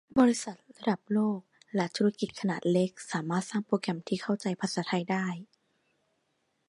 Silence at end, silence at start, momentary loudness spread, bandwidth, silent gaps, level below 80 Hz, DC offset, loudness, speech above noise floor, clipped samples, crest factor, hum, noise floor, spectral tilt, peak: 1.25 s; 0.15 s; 8 LU; 11.5 kHz; none; -70 dBFS; under 0.1%; -31 LUFS; 47 dB; under 0.1%; 20 dB; none; -76 dBFS; -5.5 dB/octave; -10 dBFS